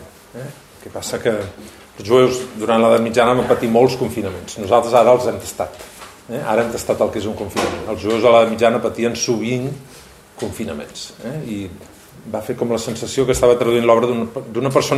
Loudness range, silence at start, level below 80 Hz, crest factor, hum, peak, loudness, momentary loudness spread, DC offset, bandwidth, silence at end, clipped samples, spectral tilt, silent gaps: 9 LU; 0 s; -48 dBFS; 16 dB; none; -2 dBFS; -17 LUFS; 18 LU; under 0.1%; 15.5 kHz; 0 s; under 0.1%; -5 dB/octave; none